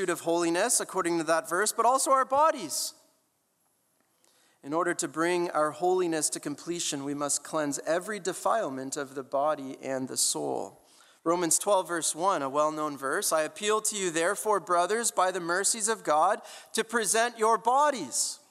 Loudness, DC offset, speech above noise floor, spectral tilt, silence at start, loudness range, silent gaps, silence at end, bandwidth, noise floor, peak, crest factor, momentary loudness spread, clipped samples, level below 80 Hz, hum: -28 LUFS; under 0.1%; 45 dB; -2 dB/octave; 0 s; 4 LU; none; 0.15 s; 16 kHz; -73 dBFS; -10 dBFS; 18 dB; 9 LU; under 0.1%; -80 dBFS; none